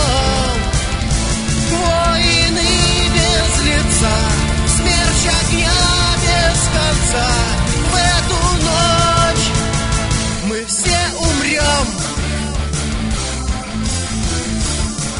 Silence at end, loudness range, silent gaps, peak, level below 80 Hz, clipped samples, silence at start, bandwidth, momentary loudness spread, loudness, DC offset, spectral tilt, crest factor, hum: 0 s; 4 LU; none; 0 dBFS; -20 dBFS; under 0.1%; 0 s; 11 kHz; 7 LU; -15 LUFS; under 0.1%; -3.5 dB/octave; 14 dB; none